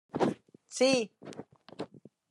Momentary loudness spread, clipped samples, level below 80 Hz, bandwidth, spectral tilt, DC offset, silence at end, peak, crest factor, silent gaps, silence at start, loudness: 21 LU; under 0.1%; -72 dBFS; 11.5 kHz; -4 dB/octave; under 0.1%; 0.45 s; -12 dBFS; 20 dB; none; 0.15 s; -30 LUFS